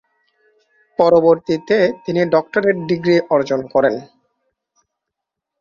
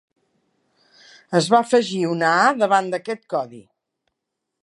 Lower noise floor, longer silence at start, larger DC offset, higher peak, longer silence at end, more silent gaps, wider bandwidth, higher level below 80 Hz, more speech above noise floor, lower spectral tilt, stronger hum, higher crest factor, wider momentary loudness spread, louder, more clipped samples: about the same, -81 dBFS vs -80 dBFS; second, 1 s vs 1.3 s; neither; about the same, -2 dBFS vs -2 dBFS; first, 1.55 s vs 1.05 s; neither; second, 7.2 kHz vs 11.5 kHz; first, -58 dBFS vs -76 dBFS; first, 66 dB vs 61 dB; first, -7 dB/octave vs -4.5 dB/octave; neither; about the same, 16 dB vs 20 dB; second, 6 LU vs 11 LU; first, -16 LUFS vs -19 LUFS; neither